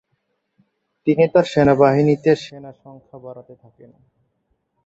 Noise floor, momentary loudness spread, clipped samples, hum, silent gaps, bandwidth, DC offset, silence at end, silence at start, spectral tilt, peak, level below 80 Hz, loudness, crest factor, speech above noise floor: -71 dBFS; 25 LU; under 0.1%; none; none; 8 kHz; under 0.1%; 1.45 s; 1.05 s; -7.5 dB/octave; -2 dBFS; -54 dBFS; -16 LUFS; 18 dB; 53 dB